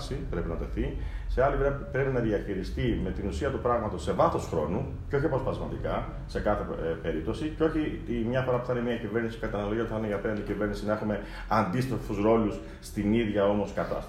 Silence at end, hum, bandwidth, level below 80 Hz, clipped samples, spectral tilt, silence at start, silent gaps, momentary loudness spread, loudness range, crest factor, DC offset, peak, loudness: 0 s; none; 15 kHz; -40 dBFS; under 0.1%; -7.5 dB/octave; 0 s; none; 7 LU; 2 LU; 18 dB; under 0.1%; -10 dBFS; -30 LUFS